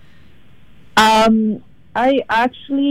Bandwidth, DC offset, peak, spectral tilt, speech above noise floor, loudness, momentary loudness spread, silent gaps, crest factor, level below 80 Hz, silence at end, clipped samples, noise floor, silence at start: 17 kHz; under 0.1%; -2 dBFS; -4 dB/octave; 34 dB; -15 LUFS; 11 LU; none; 16 dB; -46 dBFS; 0 s; under 0.1%; -49 dBFS; 0.95 s